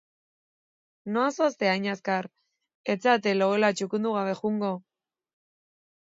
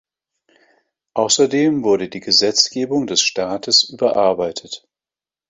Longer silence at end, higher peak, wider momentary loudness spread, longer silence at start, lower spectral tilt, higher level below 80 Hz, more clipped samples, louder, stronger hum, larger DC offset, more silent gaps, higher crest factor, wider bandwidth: first, 1.25 s vs 0.7 s; second, -8 dBFS vs 0 dBFS; about the same, 10 LU vs 11 LU; about the same, 1.05 s vs 1.15 s; first, -5 dB/octave vs -2.5 dB/octave; second, -78 dBFS vs -60 dBFS; neither; second, -26 LUFS vs -16 LUFS; neither; neither; first, 2.75-2.84 s vs none; about the same, 20 dB vs 18 dB; about the same, 7.8 kHz vs 8 kHz